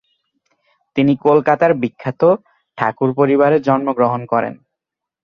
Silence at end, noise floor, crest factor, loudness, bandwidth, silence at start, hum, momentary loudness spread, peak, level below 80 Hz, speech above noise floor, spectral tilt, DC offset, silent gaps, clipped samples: 0.7 s; -83 dBFS; 16 dB; -16 LUFS; 6.6 kHz; 0.95 s; none; 8 LU; -2 dBFS; -58 dBFS; 68 dB; -9 dB/octave; under 0.1%; none; under 0.1%